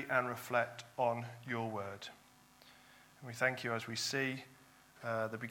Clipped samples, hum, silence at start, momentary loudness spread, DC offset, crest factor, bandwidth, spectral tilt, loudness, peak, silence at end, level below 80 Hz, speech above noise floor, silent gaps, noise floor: under 0.1%; none; 0 s; 15 LU; under 0.1%; 22 dB; 17.5 kHz; -4 dB/octave; -38 LUFS; -18 dBFS; 0 s; -82 dBFS; 25 dB; none; -63 dBFS